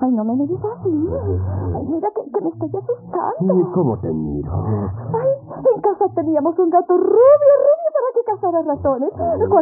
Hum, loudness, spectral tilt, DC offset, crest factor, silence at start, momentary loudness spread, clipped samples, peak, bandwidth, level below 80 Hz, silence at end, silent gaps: none; -18 LUFS; -13 dB/octave; under 0.1%; 14 dB; 0 s; 11 LU; under 0.1%; -2 dBFS; 2.4 kHz; -44 dBFS; 0 s; none